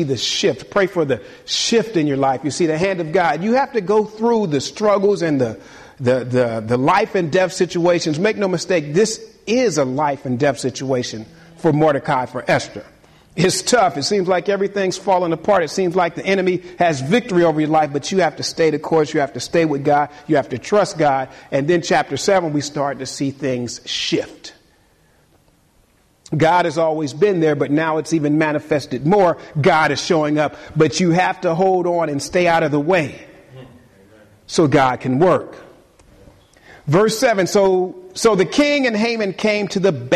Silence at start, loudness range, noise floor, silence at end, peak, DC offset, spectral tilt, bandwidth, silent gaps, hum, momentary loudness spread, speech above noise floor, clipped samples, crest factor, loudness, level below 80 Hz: 0 s; 3 LU; -56 dBFS; 0 s; -4 dBFS; under 0.1%; -5 dB/octave; 13 kHz; none; none; 7 LU; 39 dB; under 0.1%; 14 dB; -18 LUFS; -54 dBFS